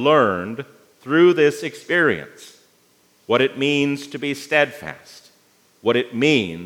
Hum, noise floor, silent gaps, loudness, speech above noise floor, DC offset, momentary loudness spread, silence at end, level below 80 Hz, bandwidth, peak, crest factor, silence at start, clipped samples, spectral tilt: none; -58 dBFS; none; -19 LUFS; 39 dB; under 0.1%; 19 LU; 0 s; -68 dBFS; 16 kHz; -2 dBFS; 18 dB; 0 s; under 0.1%; -5 dB/octave